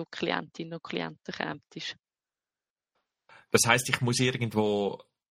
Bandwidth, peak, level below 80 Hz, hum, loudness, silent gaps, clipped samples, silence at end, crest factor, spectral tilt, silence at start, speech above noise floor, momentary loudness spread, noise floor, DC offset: 15 kHz; -4 dBFS; -66 dBFS; none; -29 LUFS; 2.71-2.76 s; under 0.1%; 0.35 s; 28 dB; -3.5 dB/octave; 0 s; over 61 dB; 16 LU; under -90 dBFS; under 0.1%